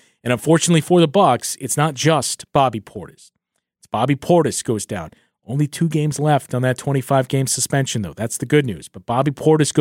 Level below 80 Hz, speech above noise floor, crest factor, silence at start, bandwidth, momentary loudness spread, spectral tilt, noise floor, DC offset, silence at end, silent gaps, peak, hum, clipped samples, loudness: -54 dBFS; 39 dB; 16 dB; 0.25 s; 16.5 kHz; 12 LU; -5 dB/octave; -57 dBFS; under 0.1%; 0 s; none; -2 dBFS; none; under 0.1%; -18 LUFS